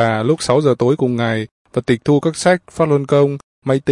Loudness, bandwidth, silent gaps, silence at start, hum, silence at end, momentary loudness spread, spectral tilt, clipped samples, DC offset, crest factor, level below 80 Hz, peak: -16 LUFS; 11.5 kHz; 1.51-1.65 s, 3.43-3.62 s; 0 s; none; 0 s; 7 LU; -6 dB/octave; under 0.1%; under 0.1%; 14 dB; -52 dBFS; -2 dBFS